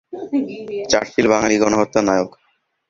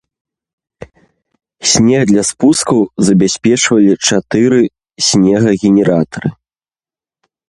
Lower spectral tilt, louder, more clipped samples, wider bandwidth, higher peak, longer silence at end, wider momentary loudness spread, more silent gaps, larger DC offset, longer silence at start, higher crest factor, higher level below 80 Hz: about the same, -4 dB/octave vs -4.5 dB/octave; second, -18 LUFS vs -11 LUFS; neither; second, 7.6 kHz vs 11.5 kHz; about the same, 0 dBFS vs 0 dBFS; second, 0.6 s vs 1.15 s; first, 11 LU vs 6 LU; neither; neither; second, 0.1 s vs 0.8 s; first, 18 dB vs 12 dB; about the same, -50 dBFS vs -46 dBFS